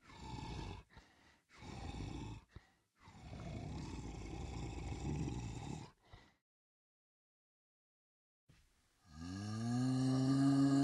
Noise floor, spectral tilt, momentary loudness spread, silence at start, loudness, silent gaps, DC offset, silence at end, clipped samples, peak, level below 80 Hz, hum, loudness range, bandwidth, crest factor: -73 dBFS; -7 dB/octave; 20 LU; 0.05 s; -41 LUFS; 6.41-8.47 s; under 0.1%; 0 s; under 0.1%; -24 dBFS; -56 dBFS; none; 14 LU; 11.5 kHz; 18 dB